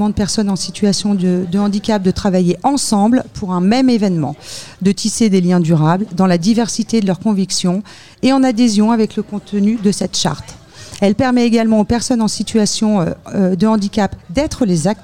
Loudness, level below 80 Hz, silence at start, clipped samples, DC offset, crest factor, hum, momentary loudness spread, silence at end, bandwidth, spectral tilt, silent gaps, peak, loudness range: -15 LUFS; -40 dBFS; 0 s; under 0.1%; 0.9%; 12 dB; none; 7 LU; 0 s; 14 kHz; -5.5 dB/octave; none; -2 dBFS; 1 LU